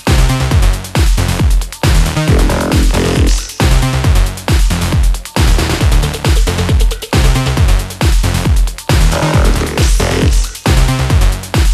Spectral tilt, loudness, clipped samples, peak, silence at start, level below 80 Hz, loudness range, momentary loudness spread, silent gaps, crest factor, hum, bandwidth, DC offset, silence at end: -5 dB/octave; -13 LUFS; under 0.1%; 0 dBFS; 0.05 s; -12 dBFS; 1 LU; 3 LU; none; 10 dB; none; 14.5 kHz; under 0.1%; 0 s